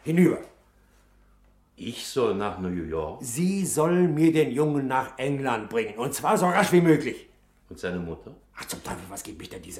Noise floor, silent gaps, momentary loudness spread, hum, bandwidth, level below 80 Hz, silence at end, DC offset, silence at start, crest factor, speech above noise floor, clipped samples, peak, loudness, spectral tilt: -59 dBFS; none; 17 LU; 50 Hz at -50 dBFS; 16 kHz; -54 dBFS; 0 s; under 0.1%; 0.05 s; 20 dB; 34 dB; under 0.1%; -6 dBFS; -25 LUFS; -5.5 dB/octave